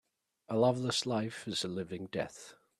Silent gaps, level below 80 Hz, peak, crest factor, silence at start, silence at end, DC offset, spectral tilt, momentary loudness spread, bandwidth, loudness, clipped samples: none; -72 dBFS; -16 dBFS; 18 dB; 0.5 s; 0.25 s; under 0.1%; -4.5 dB/octave; 10 LU; 13.5 kHz; -34 LUFS; under 0.1%